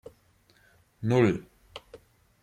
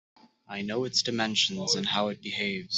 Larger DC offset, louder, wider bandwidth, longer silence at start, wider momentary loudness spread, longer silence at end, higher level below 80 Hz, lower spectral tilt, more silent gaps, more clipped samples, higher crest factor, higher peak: neither; about the same, -26 LUFS vs -28 LUFS; first, 12 kHz vs 8.2 kHz; first, 1 s vs 0.5 s; first, 23 LU vs 8 LU; first, 0.45 s vs 0 s; first, -62 dBFS vs -70 dBFS; first, -7.5 dB/octave vs -2.5 dB/octave; neither; neither; about the same, 20 dB vs 20 dB; about the same, -10 dBFS vs -10 dBFS